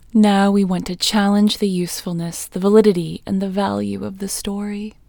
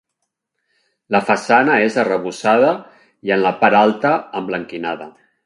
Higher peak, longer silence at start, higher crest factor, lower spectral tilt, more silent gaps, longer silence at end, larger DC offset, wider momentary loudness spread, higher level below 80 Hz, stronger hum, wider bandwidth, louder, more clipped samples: about the same, 0 dBFS vs 0 dBFS; second, 0.15 s vs 1.1 s; about the same, 18 dB vs 18 dB; about the same, -5.5 dB/octave vs -5.5 dB/octave; neither; second, 0.2 s vs 0.35 s; neither; about the same, 11 LU vs 12 LU; first, -48 dBFS vs -64 dBFS; neither; first, 19.5 kHz vs 11.5 kHz; about the same, -18 LUFS vs -16 LUFS; neither